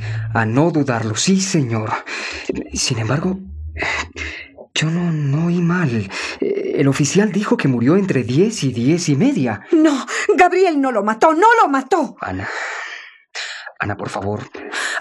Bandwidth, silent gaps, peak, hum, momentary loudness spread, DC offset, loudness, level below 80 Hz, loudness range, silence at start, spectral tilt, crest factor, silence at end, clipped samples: 12.5 kHz; none; 0 dBFS; none; 13 LU; under 0.1%; -18 LUFS; -46 dBFS; 7 LU; 0 s; -5 dB/octave; 16 dB; 0 s; under 0.1%